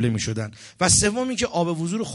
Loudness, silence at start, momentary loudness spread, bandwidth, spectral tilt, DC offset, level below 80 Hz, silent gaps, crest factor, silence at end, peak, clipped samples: -22 LUFS; 0 s; 12 LU; 11.5 kHz; -3.5 dB/octave; under 0.1%; -42 dBFS; none; 18 dB; 0 s; -6 dBFS; under 0.1%